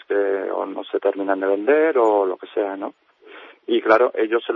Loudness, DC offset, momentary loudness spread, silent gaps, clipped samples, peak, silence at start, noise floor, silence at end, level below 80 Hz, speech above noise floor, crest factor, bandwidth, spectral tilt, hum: -20 LUFS; under 0.1%; 10 LU; none; under 0.1%; -2 dBFS; 0.1 s; -44 dBFS; 0 s; -78 dBFS; 25 dB; 18 dB; 7.4 kHz; -5.5 dB/octave; none